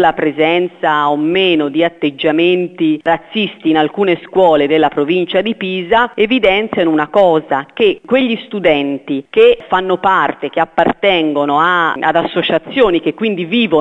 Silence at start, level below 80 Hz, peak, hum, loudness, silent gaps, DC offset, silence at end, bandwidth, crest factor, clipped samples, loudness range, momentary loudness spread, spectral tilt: 0 s; -46 dBFS; 0 dBFS; none; -13 LUFS; none; under 0.1%; 0 s; 7.8 kHz; 12 dB; under 0.1%; 1 LU; 5 LU; -7 dB/octave